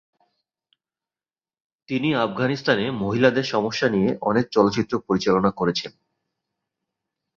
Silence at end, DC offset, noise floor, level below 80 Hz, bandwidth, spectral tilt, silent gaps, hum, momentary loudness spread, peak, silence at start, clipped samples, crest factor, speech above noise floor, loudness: 1.5 s; under 0.1%; under -90 dBFS; -56 dBFS; 7.6 kHz; -6 dB/octave; none; none; 6 LU; -2 dBFS; 1.9 s; under 0.1%; 20 dB; over 69 dB; -22 LUFS